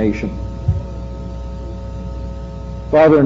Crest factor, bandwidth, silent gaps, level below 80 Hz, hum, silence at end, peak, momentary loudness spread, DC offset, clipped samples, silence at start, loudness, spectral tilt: 16 dB; 7.6 kHz; none; -28 dBFS; none; 0 s; -2 dBFS; 15 LU; under 0.1%; under 0.1%; 0 s; -21 LUFS; -7.5 dB/octave